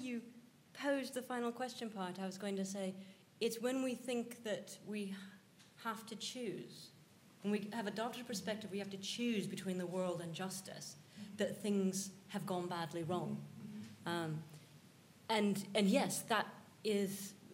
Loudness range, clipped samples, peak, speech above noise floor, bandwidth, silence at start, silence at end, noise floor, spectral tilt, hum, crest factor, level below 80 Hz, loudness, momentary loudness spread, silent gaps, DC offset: 6 LU; under 0.1%; -18 dBFS; 23 dB; 16 kHz; 0 s; 0 s; -64 dBFS; -4.5 dB/octave; none; 24 dB; -88 dBFS; -41 LUFS; 15 LU; none; under 0.1%